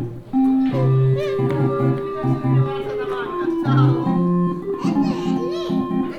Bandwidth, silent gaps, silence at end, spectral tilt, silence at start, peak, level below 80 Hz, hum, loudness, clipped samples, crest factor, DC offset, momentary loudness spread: 6.8 kHz; none; 0 s; -9 dB/octave; 0 s; -4 dBFS; -48 dBFS; none; -20 LUFS; under 0.1%; 14 dB; under 0.1%; 6 LU